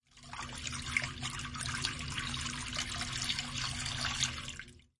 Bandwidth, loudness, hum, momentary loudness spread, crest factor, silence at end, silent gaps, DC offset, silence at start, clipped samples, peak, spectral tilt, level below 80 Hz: 11.5 kHz; -36 LUFS; none; 9 LU; 24 dB; 0.2 s; none; under 0.1%; 0.15 s; under 0.1%; -16 dBFS; -1.5 dB/octave; -52 dBFS